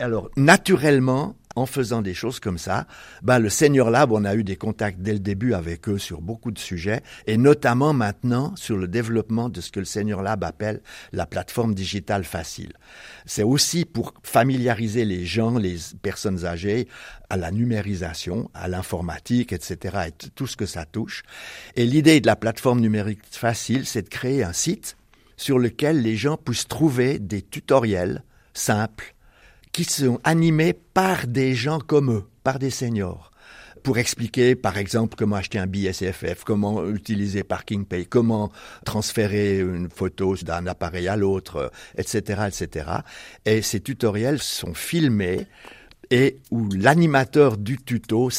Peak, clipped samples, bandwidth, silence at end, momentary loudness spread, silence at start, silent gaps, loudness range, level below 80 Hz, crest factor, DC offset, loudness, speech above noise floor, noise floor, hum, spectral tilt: 0 dBFS; under 0.1%; 16 kHz; 0 s; 12 LU; 0 s; none; 5 LU; -50 dBFS; 22 dB; under 0.1%; -23 LUFS; 30 dB; -52 dBFS; none; -5.5 dB/octave